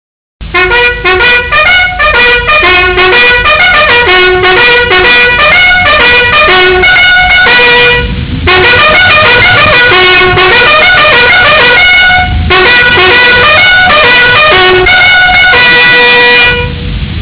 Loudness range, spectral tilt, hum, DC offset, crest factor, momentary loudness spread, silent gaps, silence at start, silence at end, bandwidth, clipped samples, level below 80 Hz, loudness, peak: 1 LU; -7 dB/octave; none; under 0.1%; 4 dB; 4 LU; none; 0.4 s; 0 s; 4 kHz; under 0.1%; -22 dBFS; -2 LUFS; 0 dBFS